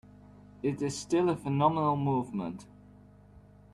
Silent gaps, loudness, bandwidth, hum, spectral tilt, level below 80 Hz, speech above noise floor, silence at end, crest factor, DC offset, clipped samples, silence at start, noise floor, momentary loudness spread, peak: none; -30 LUFS; 12 kHz; 50 Hz at -50 dBFS; -6.5 dB/octave; -62 dBFS; 26 dB; 0.35 s; 20 dB; under 0.1%; under 0.1%; 0.65 s; -55 dBFS; 10 LU; -12 dBFS